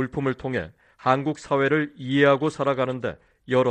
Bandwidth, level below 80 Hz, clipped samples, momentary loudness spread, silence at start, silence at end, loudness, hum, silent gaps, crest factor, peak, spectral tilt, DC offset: 9.4 kHz; -56 dBFS; under 0.1%; 11 LU; 0 s; 0 s; -24 LUFS; none; none; 20 dB; -4 dBFS; -6.5 dB/octave; under 0.1%